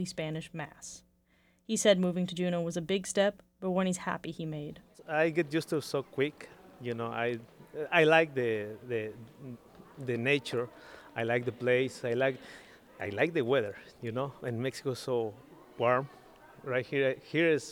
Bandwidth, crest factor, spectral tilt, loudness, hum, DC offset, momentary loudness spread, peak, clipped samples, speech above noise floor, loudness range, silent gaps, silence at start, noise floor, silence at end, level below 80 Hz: 19 kHz; 22 dB; -5 dB/octave; -32 LUFS; none; under 0.1%; 18 LU; -10 dBFS; under 0.1%; 37 dB; 4 LU; none; 0 s; -68 dBFS; 0 s; -70 dBFS